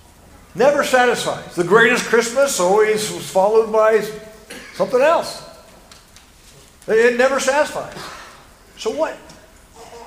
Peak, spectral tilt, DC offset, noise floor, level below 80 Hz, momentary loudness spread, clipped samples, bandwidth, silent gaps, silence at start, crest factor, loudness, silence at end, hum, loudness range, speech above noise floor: 0 dBFS; -3 dB/octave; under 0.1%; -46 dBFS; -52 dBFS; 20 LU; under 0.1%; 16 kHz; none; 0.55 s; 18 dB; -16 LUFS; 0 s; none; 5 LU; 30 dB